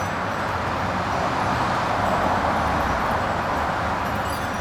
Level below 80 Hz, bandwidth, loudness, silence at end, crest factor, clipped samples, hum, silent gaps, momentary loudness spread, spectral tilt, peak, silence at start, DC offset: -38 dBFS; 19 kHz; -23 LUFS; 0 s; 14 dB; under 0.1%; none; none; 4 LU; -5 dB/octave; -10 dBFS; 0 s; under 0.1%